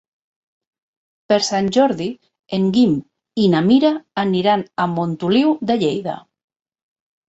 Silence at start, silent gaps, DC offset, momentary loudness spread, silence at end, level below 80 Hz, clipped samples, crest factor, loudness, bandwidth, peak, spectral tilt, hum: 1.3 s; none; under 0.1%; 10 LU; 1.1 s; -60 dBFS; under 0.1%; 16 dB; -18 LUFS; 8 kHz; -2 dBFS; -6 dB/octave; none